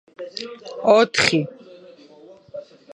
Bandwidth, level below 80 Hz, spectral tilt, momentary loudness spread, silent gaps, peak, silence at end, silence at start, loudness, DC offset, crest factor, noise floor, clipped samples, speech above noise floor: 11.5 kHz; -62 dBFS; -4 dB/octave; 23 LU; none; 0 dBFS; 0.3 s; 0.2 s; -17 LUFS; under 0.1%; 22 dB; -47 dBFS; under 0.1%; 27 dB